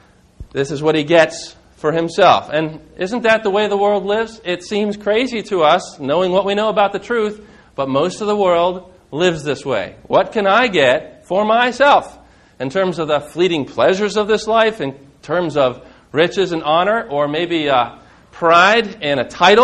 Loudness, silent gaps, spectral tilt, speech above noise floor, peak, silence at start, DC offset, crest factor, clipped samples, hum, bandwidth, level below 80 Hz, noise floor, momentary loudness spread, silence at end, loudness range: -16 LUFS; none; -4.5 dB/octave; 23 dB; 0 dBFS; 0.4 s; under 0.1%; 16 dB; under 0.1%; none; 11 kHz; -50 dBFS; -39 dBFS; 11 LU; 0 s; 2 LU